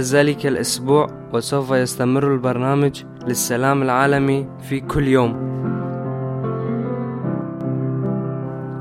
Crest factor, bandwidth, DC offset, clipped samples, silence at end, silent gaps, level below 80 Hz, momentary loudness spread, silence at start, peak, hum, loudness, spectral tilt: 18 dB; 16 kHz; under 0.1%; under 0.1%; 0 s; none; -46 dBFS; 9 LU; 0 s; -2 dBFS; none; -20 LUFS; -5.5 dB/octave